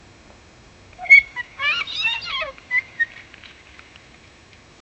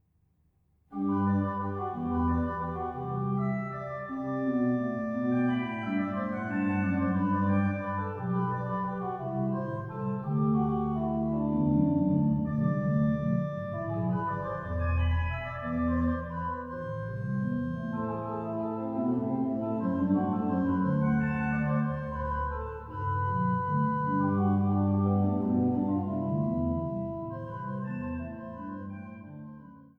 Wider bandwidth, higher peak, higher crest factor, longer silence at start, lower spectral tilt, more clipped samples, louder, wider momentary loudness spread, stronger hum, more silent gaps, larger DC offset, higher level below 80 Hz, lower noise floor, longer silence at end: first, 8.4 kHz vs 4.2 kHz; first, -2 dBFS vs -14 dBFS; first, 22 dB vs 16 dB; about the same, 1 s vs 0.9 s; second, -1 dB/octave vs -10.5 dB/octave; neither; first, -17 LUFS vs -30 LUFS; first, 16 LU vs 9 LU; neither; neither; neither; second, -56 dBFS vs -46 dBFS; second, -48 dBFS vs -69 dBFS; first, 1.8 s vs 0.15 s